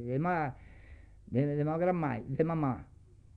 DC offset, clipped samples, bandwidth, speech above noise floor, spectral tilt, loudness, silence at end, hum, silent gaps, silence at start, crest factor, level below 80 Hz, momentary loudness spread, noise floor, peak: under 0.1%; under 0.1%; 4.9 kHz; 22 dB; -10.5 dB/octave; -33 LUFS; 0.55 s; 50 Hz at -50 dBFS; none; 0 s; 16 dB; -56 dBFS; 8 LU; -53 dBFS; -16 dBFS